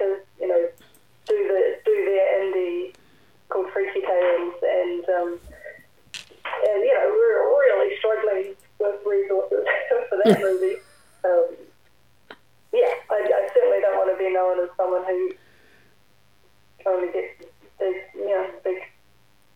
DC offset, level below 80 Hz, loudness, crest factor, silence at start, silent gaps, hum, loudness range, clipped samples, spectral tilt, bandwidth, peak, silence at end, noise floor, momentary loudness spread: 0.1%; -64 dBFS; -23 LUFS; 20 dB; 0 s; none; none; 7 LU; under 0.1%; -6 dB/octave; 14.5 kHz; -4 dBFS; 0.7 s; -61 dBFS; 13 LU